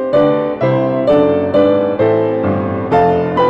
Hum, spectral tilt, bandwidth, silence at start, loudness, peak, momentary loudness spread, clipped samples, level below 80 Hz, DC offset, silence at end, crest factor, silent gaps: none; -9 dB/octave; 6.2 kHz; 0 s; -13 LUFS; -4 dBFS; 3 LU; under 0.1%; -46 dBFS; under 0.1%; 0 s; 10 dB; none